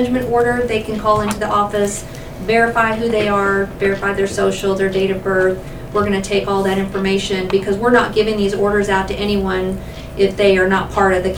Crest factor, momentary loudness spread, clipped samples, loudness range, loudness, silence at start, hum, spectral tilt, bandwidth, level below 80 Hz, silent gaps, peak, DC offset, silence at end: 16 dB; 6 LU; under 0.1%; 1 LU; -16 LUFS; 0 s; none; -5 dB/octave; 19 kHz; -34 dBFS; none; 0 dBFS; 0.3%; 0 s